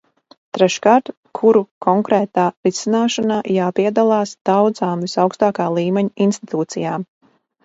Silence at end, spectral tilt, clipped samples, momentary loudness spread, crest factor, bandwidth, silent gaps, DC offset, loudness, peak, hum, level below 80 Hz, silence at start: 0.6 s; -5.5 dB/octave; under 0.1%; 8 LU; 18 dB; 8 kHz; 1.17-1.23 s, 1.71-1.81 s, 2.57-2.63 s, 4.41-4.45 s; under 0.1%; -17 LUFS; 0 dBFS; none; -64 dBFS; 0.55 s